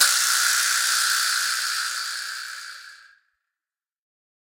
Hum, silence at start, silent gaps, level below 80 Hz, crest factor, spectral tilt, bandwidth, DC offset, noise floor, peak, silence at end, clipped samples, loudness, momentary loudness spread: none; 0 s; none; -76 dBFS; 24 dB; 6.5 dB/octave; 17 kHz; under 0.1%; under -90 dBFS; -2 dBFS; 1.45 s; under 0.1%; -20 LUFS; 16 LU